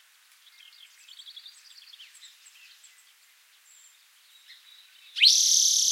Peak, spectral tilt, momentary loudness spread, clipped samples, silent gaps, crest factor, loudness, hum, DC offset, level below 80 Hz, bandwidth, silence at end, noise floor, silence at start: -4 dBFS; 12.5 dB/octave; 29 LU; under 0.1%; none; 24 dB; -18 LUFS; none; under 0.1%; under -90 dBFS; 16.5 kHz; 0 s; -60 dBFS; 1.25 s